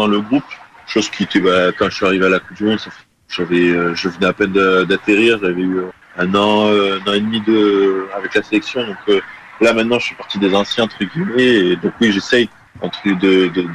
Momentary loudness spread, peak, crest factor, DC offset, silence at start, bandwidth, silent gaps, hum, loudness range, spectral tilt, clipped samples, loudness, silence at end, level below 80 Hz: 9 LU; -2 dBFS; 14 dB; under 0.1%; 0 s; 11 kHz; none; none; 2 LU; -5.5 dB/octave; under 0.1%; -15 LUFS; 0 s; -52 dBFS